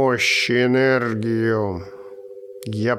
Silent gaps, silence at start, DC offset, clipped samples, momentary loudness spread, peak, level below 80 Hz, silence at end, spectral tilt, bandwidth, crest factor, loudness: none; 0 s; under 0.1%; under 0.1%; 22 LU; -6 dBFS; -56 dBFS; 0 s; -5 dB/octave; 15.5 kHz; 14 dB; -19 LUFS